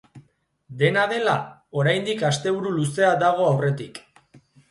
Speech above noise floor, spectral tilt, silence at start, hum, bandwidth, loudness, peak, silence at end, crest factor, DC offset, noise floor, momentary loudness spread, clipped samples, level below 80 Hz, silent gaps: 39 dB; -5.5 dB/octave; 0.15 s; none; 11.5 kHz; -22 LUFS; -6 dBFS; 0.7 s; 18 dB; under 0.1%; -61 dBFS; 12 LU; under 0.1%; -64 dBFS; none